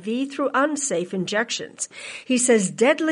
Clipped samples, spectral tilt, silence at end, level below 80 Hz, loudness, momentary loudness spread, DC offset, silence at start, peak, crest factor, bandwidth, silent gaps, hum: under 0.1%; -3.5 dB/octave; 0 s; -72 dBFS; -22 LUFS; 12 LU; under 0.1%; 0 s; -6 dBFS; 16 dB; 11.5 kHz; none; none